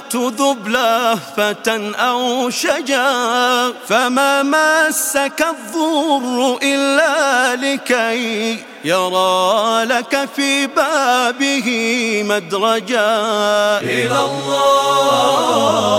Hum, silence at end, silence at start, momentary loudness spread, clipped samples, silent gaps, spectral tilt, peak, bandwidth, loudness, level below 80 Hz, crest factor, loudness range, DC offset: none; 0 s; 0 s; 5 LU; under 0.1%; none; -2.5 dB/octave; 0 dBFS; 16.5 kHz; -15 LUFS; -64 dBFS; 14 dB; 1 LU; under 0.1%